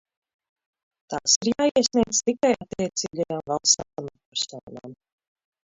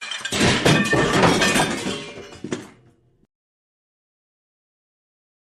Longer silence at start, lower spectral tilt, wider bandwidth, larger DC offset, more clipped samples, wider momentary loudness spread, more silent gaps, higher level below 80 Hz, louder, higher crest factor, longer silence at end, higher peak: first, 1.1 s vs 0 s; second, -2.5 dB/octave vs -4 dB/octave; second, 8 kHz vs 14 kHz; neither; neither; about the same, 16 LU vs 16 LU; first, 1.36-1.41 s, 4.26-4.32 s, 4.63-4.67 s vs none; second, -60 dBFS vs -46 dBFS; second, -23 LUFS vs -18 LUFS; about the same, 22 dB vs 20 dB; second, 0.75 s vs 2.85 s; about the same, -4 dBFS vs -4 dBFS